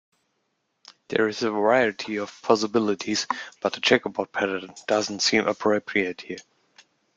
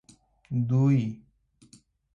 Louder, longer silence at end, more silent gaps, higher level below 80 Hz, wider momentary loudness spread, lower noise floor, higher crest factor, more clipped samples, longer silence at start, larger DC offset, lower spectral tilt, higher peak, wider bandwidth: about the same, -24 LUFS vs -26 LUFS; second, 0.75 s vs 1 s; neither; second, -68 dBFS vs -62 dBFS; second, 9 LU vs 14 LU; first, -75 dBFS vs -59 dBFS; first, 22 dB vs 14 dB; neither; first, 1.1 s vs 0.5 s; neither; second, -3.5 dB/octave vs -9.5 dB/octave; first, -4 dBFS vs -14 dBFS; about the same, 9.4 kHz vs 9.2 kHz